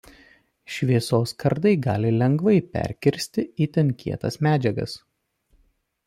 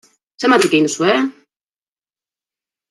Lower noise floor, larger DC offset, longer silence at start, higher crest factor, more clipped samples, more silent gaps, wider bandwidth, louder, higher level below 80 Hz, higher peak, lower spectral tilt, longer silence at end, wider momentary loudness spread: second, -65 dBFS vs under -90 dBFS; neither; first, 0.7 s vs 0.4 s; about the same, 18 dB vs 16 dB; neither; neither; first, 15.5 kHz vs 12.5 kHz; second, -23 LUFS vs -15 LUFS; first, -54 dBFS vs -68 dBFS; second, -6 dBFS vs -2 dBFS; first, -7 dB/octave vs -3.5 dB/octave; second, 1.1 s vs 1.6 s; about the same, 9 LU vs 7 LU